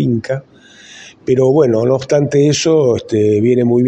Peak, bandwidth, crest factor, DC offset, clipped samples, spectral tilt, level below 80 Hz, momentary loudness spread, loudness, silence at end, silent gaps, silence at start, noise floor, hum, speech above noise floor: 0 dBFS; 9 kHz; 12 dB; under 0.1%; under 0.1%; -6.5 dB/octave; -52 dBFS; 8 LU; -13 LUFS; 0 s; none; 0 s; -39 dBFS; none; 26 dB